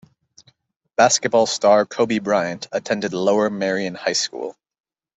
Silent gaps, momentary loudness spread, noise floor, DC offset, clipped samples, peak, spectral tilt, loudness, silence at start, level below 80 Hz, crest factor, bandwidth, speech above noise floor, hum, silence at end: none; 10 LU; -61 dBFS; under 0.1%; under 0.1%; -2 dBFS; -3 dB/octave; -19 LUFS; 1 s; -64 dBFS; 18 dB; 8.4 kHz; 42 dB; none; 0.65 s